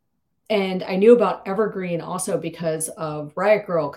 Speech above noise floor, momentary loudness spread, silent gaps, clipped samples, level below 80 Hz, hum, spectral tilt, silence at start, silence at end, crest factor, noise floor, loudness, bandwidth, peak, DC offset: 37 dB; 12 LU; none; under 0.1%; -66 dBFS; none; -5 dB/octave; 0.5 s; 0 s; 20 dB; -58 dBFS; -21 LUFS; 15.5 kHz; -2 dBFS; under 0.1%